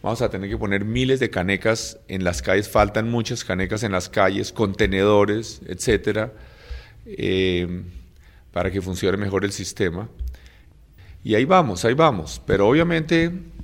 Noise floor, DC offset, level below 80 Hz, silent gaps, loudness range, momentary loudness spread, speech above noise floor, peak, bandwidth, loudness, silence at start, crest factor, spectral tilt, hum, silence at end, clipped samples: -49 dBFS; under 0.1%; -40 dBFS; none; 5 LU; 14 LU; 28 dB; -2 dBFS; 16.5 kHz; -21 LUFS; 0.05 s; 20 dB; -5.5 dB/octave; none; 0 s; under 0.1%